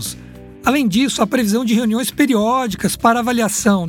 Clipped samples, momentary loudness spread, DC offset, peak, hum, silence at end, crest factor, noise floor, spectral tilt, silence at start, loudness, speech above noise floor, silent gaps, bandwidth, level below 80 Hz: under 0.1%; 5 LU; under 0.1%; -2 dBFS; none; 0 s; 16 dB; -37 dBFS; -4.5 dB/octave; 0 s; -16 LUFS; 21 dB; none; 17.5 kHz; -46 dBFS